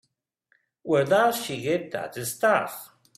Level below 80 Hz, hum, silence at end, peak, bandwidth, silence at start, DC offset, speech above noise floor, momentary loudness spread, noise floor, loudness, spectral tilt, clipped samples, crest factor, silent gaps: -70 dBFS; none; 0.3 s; -8 dBFS; 16 kHz; 0.85 s; under 0.1%; 46 dB; 13 LU; -71 dBFS; -25 LUFS; -4 dB/octave; under 0.1%; 20 dB; none